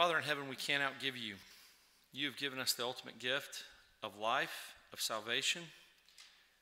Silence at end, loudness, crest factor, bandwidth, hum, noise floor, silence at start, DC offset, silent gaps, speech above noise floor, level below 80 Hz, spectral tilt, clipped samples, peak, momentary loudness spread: 0.35 s; -38 LUFS; 24 dB; 16 kHz; none; -67 dBFS; 0 s; under 0.1%; none; 28 dB; -82 dBFS; -1.5 dB/octave; under 0.1%; -18 dBFS; 17 LU